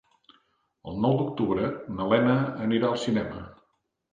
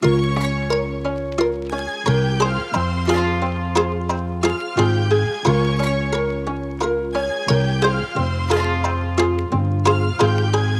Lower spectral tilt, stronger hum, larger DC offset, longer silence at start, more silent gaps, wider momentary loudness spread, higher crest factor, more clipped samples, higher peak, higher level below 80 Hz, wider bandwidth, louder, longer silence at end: first, -7.5 dB/octave vs -6 dB/octave; neither; neither; first, 0.85 s vs 0 s; neither; first, 16 LU vs 6 LU; about the same, 20 dB vs 16 dB; neither; second, -8 dBFS vs -4 dBFS; second, -56 dBFS vs -36 dBFS; second, 9.4 kHz vs 12.5 kHz; second, -26 LUFS vs -20 LUFS; first, 0.6 s vs 0 s